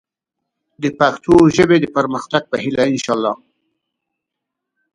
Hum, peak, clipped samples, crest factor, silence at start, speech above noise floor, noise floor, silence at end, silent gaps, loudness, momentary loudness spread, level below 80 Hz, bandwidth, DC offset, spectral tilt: none; 0 dBFS; under 0.1%; 18 dB; 0.8 s; 65 dB; -80 dBFS; 1.6 s; none; -15 LUFS; 12 LU; -46 dBFS; 11 kHz; under 0.1%; -5.5 dB/octave